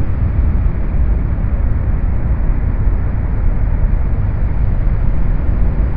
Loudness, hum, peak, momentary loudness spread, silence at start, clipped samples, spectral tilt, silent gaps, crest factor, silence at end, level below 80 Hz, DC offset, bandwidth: -18 LUFS; none; -2 dBFS; 2 LU; 0 s; under 0.1%; -12.5 dB/octave; none; 12 dB; 0 s; -14 dBFS; under 0.1%; 2.8 kHz